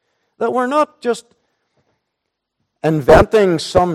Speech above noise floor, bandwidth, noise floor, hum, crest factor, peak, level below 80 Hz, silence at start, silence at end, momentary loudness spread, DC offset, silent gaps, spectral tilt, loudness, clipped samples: 63 dB; 15 kHz; -76 dBFS; none; 16 dB; 0 dBFS; -34 dBFS; 0.4 s; 0 s; 12 LU; under 0.1%; none; -6 dB/octave; -15 LUFS; under 0.1%